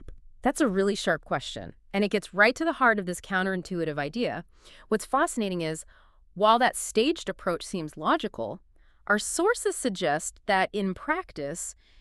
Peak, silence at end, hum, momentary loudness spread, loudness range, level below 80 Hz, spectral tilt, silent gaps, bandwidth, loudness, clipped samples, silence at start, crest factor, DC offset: -6 dBFS; 0.3 s; none; 13 LU; 3 LU; -54 dBFS; -4 dB/octave; none; 13.5 kHz; -27 LUFS; under 0.1%; 0 s; 22 dB; under 0.1%